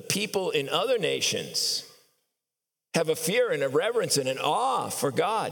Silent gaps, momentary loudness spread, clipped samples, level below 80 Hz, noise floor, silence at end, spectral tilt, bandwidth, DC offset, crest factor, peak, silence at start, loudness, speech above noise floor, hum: none; 3 LU; under 0.1%; -84 dBFS; -88 dBFS; 0 s; -2.5 dB/octave; 19 kHz; under 0.1%; 20 dB; -8 dBFS; 0 s; -26 LUFS; 61 dB; none